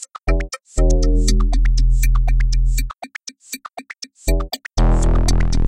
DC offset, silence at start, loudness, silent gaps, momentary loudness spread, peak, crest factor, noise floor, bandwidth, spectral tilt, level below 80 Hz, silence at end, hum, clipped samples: under 0.1%; 0 s; -20 LUFS; none; 14 LU; -2 dBFS; 14 dB; -36 dBFS; 15.5 kHz; -5 dB/octave; -16 dBFS; 0 s; none; under 0.1%